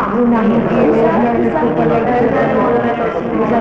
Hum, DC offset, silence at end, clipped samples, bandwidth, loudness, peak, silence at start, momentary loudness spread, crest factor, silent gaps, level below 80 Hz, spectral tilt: none; under 0.1%; 0 s; under 0.1%; 6.4 kHz; -13 LUFS; -4 dBFS; 0 s; 4 LU; 10 dB; none; -38 dBFS; -9 dB/octave